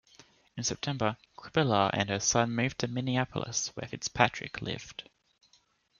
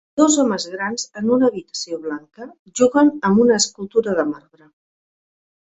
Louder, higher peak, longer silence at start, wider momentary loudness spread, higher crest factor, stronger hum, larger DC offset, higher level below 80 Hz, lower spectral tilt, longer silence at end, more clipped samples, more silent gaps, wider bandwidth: second, -30 LUFS vs -18 LUFS; second, -6 dBFS vs -2 dBFS; first, 0.55 s vs 0.15 s; second, 11 LU vs 16 LU; first, 26 dB vs 18 dB; neither; neither; about the same, -62 dBFS vs -62 dBFS; about the same, -3.5 dB/octave vs -4 dB/octave; second, 1 s vs 1.4 s; neither; second, none vs 2.59-2.66 s; second, 7.4 kHz vs 8.4 kHz